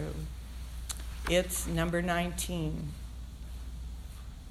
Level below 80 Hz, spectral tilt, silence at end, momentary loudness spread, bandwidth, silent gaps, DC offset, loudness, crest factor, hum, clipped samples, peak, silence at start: -40 dBFS; -4.5 dB/octave; 0 s; 15 LU; 15.5 kHz; none; under 0.1%; -34 LUFS; 20 dB; none; under 0.1%; -14 dBFS; 0 s